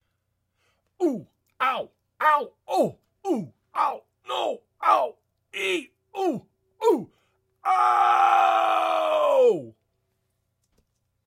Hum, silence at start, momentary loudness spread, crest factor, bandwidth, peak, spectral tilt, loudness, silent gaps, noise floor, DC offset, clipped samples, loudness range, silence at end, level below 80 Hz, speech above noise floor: none; 1 s; 13 LU; 18 dB; 16.5 kHz; -6 dBFS; -4.5 dB/octave; -24 LUFS; none; -76 dBFS; under 0.1%; under 0.1%; 6 LU; 1.55 s; -80 dBFS; 52 dB